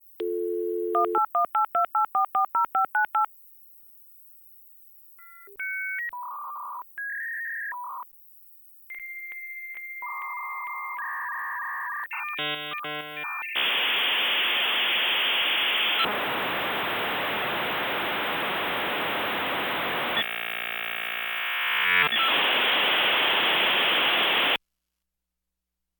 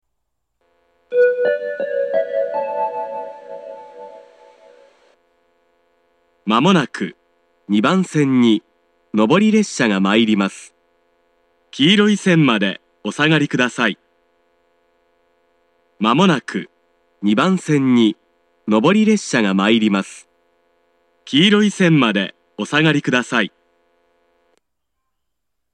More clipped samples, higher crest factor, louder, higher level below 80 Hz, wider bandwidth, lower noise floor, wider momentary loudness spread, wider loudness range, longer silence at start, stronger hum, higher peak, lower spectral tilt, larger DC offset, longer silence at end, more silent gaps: neither; about the same, 16 dB vs 18 dB; second, -25 LUFS vs -16 LUFS; about the same, -70 dBFS vs -70 dBFS; first, 19 kHz vs 10 kHz; first, -84 dBFS vs -78 dBFS; about the same, 14 LU vs 16 LU; first, 13 LU vs 6 LU; second, 0.2 s vs 1.1 s; neither; second, -10 dBFS vs 0 dBFS; second, -3 dB/octave vs -5.5 dB/octave; neither; second, 1.45 s vs 2.25 s; neither